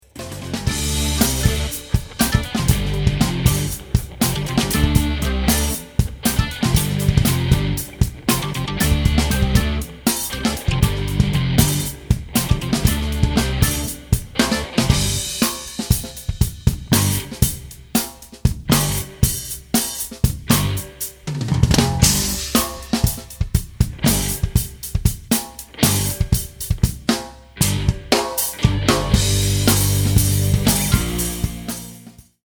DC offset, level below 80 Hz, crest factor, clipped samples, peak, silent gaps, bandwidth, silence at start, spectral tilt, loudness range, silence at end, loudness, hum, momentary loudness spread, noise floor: under 0.1%; -26 dBFS; 20 dB; under 0.1%; 0 dBFS; none; over 20 kHz; 0.15 s; -4.5 dB/octave; 3 LU; 0.45 s; -19 LUFS; none; 7 LU; -43 dBFS